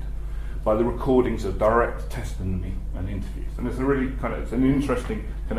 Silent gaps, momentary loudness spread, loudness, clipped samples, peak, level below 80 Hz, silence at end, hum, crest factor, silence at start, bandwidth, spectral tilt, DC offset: none; 11 LU; -25 LUFS; under 0.1%; -6 dBFS; -30 dBFS; 0 s; none; 18 dB; 0 s; 14.5 kHz; -7.5 dB/octave; under 0.1%